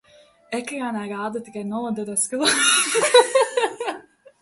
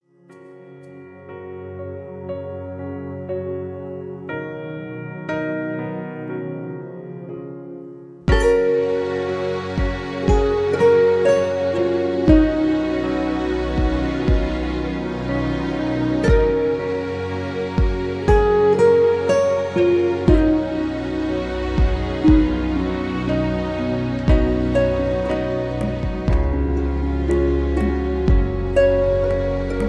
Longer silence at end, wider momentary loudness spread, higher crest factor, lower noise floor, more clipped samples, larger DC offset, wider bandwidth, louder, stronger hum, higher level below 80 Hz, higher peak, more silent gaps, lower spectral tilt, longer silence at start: first, 0.4 s vs 0 s; about the same, 15 LU vs 16 LU; about the same, 22 dB vs 18 dB; second, -41 dBFS vs -46 dBFS; neither; neither; first, 12 kHz vs 10 kHz; about the same, -20 LUFS vs -20 LUFS; neither; second, -70 dBFS vs -26 dBFS; about the same, 0 dBFS vs -2 dBFS; neither; second, -1.5 dB/octave vs -8 dB/octave; first, 0.5 s vs 0.3 s